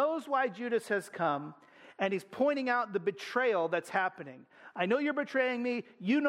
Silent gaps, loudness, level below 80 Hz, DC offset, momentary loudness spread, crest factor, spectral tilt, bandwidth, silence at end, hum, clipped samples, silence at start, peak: none; -32 LUFS; -82 dBFS; under 0.1%; 6 LU; 16 dB; -5.5 dB/octave; 15.5 kHz; 0 s; none; under 0.1%; 0 s; -16 dBFS